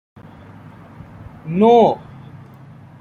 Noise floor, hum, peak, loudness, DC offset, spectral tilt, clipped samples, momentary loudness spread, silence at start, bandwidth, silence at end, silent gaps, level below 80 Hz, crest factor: -41 dBFS; none; -2 dBFS; -15 LUFS; under 0.1%; -8.5 dB/octave; under 0.1%; 27 LU; 1.2 s; 6.8 kHz; 0.65 s; none; -54 dBFS; 18 dB